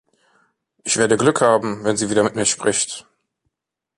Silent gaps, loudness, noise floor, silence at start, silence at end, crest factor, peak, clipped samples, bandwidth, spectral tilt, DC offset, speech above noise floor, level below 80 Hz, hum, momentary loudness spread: none; -18 LUFS; -79 dBFS; 0.85 s; 0.95 s; 18 dB; -2 dBFS; under 0.1%; 11.5 kHz; -3.5 dB/octave; under 0.1%; 61 dB; -58 dBFS; none; 8 LU